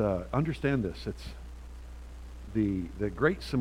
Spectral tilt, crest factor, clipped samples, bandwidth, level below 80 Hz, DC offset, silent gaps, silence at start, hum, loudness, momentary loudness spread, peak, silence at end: -7.5 dB/octave; 20 dB; under 0.1%; 15.5 kHz; -44 dBFS; under 0.1%; none; 0 s; none; -31 LUFS; 18 LU; -10 dBFS; 0 s